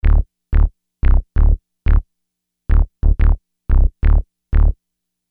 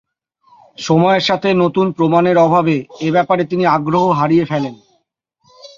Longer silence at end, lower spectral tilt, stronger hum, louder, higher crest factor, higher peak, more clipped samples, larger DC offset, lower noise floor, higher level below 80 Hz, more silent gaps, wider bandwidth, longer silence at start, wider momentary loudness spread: first, 0.55 s vs 0.1 s; first, -11 dB/octave vs -6.5 dB/octave; first, 60 Hz at -55 dBFS vs none; second, -19 LUFS vs -14 LUFS; about the same, 12 dB vs 14 dB; about the same, -2 dBFS vs -2 dBFS; neither; neither; first, -77 dBFS vs -65 dBFS; first, -16 dBFS vs -56 dBFS; neither; second, 3 kHz vs 7.4 kHz; second, 0.05 s vs 0.8 s; about the same, 5 LU vs 7 LU